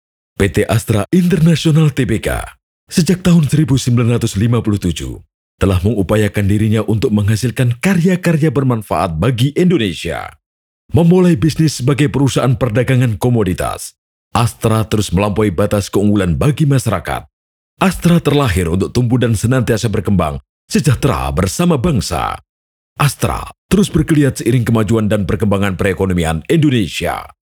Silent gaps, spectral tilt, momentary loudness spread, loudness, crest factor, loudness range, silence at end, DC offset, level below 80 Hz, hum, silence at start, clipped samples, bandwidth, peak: 2.63-2.87 s, 5.34-5.58 s, 10.46-10.89 s, 13.98-14.31 s, 17.33-17.77 s, 20.49-20.68 s, 22.49-22.96 s, 23.58-23.69 s; -6.5 dB/octave; 8 LU; -14 LUFS; 14 dB; 2 LU; 0.25 s; under 0.1%; -32 dBFS; none; 0.4 s; under 0.1%; 20 kHz; 0 dBFS